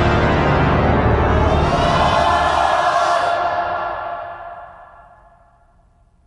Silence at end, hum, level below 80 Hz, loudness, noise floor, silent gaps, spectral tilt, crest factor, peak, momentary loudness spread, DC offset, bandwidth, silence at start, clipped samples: 1.4 s; none; -26 dBFS; -16 LUFS; -53 dBFS; none; -6 dB/octave; 14 dB; -4 dBFS; 13 LU; under 0.1%; 11 kHz; 0 s; under 0.1%